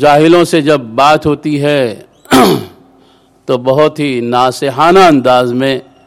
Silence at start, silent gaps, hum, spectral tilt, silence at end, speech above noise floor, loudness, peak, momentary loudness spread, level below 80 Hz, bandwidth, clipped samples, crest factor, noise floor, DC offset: 0 s; none; none; -5.5 dB/octave; 0.25 s; 37 dB; -10 LUFS; 0 dBFS; 9 LU; -44 dBFS; 16.5 kHz; 0.5%; 10 dB; -46 dBFS; under 0.1%